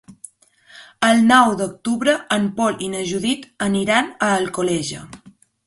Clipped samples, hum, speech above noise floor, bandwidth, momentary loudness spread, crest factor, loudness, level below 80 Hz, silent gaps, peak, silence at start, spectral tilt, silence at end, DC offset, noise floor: under 0.1%; none; 32 dB; 11.5 kHz; 11 LU; 20 dB; -18 LUFS; -56 dBFS; none; 0 dBFS; 0.1 s; -4 dB/octave; 0.5 s; under 0.1%; -51 dBFS